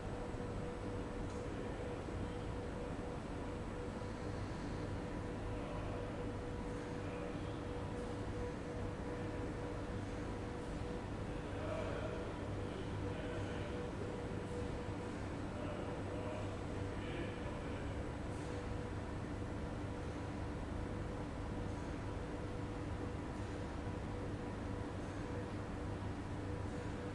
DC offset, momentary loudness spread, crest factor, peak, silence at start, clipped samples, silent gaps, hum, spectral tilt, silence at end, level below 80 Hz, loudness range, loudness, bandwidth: under 0.1%; 2 LU; 14 dB; -30 dBFS; 0 s; under 0.1%; none; none; -7 dB/octave; 0 s; -52 dBFS; 1 LU; -44 LUFS; 11.5 kHz